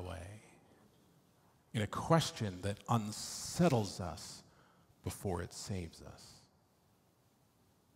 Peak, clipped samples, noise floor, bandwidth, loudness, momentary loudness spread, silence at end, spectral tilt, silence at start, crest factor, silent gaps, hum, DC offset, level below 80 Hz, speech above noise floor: -14 dBFS; under 0.1%; -71 dBFS; 16 kHz; -37 LUFS; 22 LU; 1.55 s; -5 dB/octave; 0 s; 26 dB; none; none; under 0.1%; -66 dBFS; 35 dB